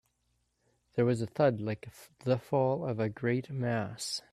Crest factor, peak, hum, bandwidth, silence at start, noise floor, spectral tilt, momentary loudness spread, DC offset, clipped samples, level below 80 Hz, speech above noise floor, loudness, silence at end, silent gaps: 18 dB; -16 dBFS; none; 14 kHz; 0.95 s; -77 dBFS; -6 dB/octave; 10 LU; under 0.1%; under 0.1%; -68 dBFS; 45 dB; -32 LUFS; 0.15 s; none